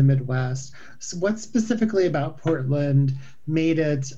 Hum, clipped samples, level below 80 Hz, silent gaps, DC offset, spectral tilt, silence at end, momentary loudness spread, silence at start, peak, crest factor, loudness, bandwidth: none; under 0.1%; -56 dBFS; none; 1%; -7 dB/octave; 0 s; 12 LU; 0 s; -8 dBFS; 14 dB; -23 LUFS; 8 kHz